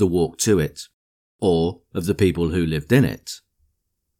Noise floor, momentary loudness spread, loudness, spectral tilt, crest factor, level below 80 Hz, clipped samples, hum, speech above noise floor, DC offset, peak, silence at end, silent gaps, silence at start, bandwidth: -74 dBFS; 17 LU; -21 LUFS; -5.5 dB/octave; 16 dB; -42 dBFS; under 0.1%; none; 54 dB; under 0.1%; -4 dBFS; 0.8 s; 0.93-1.39 s; 0 s; 18.5 kHz